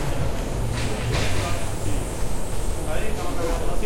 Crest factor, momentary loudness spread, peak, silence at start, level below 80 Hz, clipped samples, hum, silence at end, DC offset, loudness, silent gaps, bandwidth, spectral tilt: 12 dB; 5 LU; -10 dBFS; 0 s; -28 dBFS; under 0.1%; none; 0 s; under 0.1%; -27 LUFS; none; 16.5 kHz; -5 dB/octave